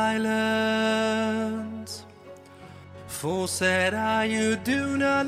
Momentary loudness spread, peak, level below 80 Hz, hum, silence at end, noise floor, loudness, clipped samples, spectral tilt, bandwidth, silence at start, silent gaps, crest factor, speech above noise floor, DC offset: 15 LU; -10 dBFS; -60 dBFS; none; 0 s; -47 dBFS; -25 LUFS; under 0.1%; -4 dB/octave; 15.5 kHz; 0 s; none; 16 dB; 22 dB; under 0.1%